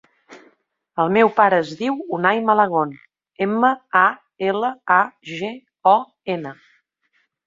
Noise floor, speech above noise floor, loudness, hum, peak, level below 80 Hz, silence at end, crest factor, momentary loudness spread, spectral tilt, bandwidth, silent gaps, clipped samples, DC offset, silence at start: -67 dBFS; 49 dB; -19 LUFS; none; -2 dBFS; -68 dBFS; 0.95 s; 18 dB; 12 LU; -6.5 dB/octave; 7.6 kHz; none; under 0.1%; under 0.1%; 0.3 s